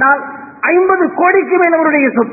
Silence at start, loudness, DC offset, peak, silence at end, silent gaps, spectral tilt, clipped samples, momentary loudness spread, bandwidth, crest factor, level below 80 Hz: 0 s; -11 LUFS; under 0.1%; 0 dBFS; 0 s; none; -10.5 dB/octave; under 0.1%; 6 LU; 2.7 kHz; 12 dB; -58 dBFS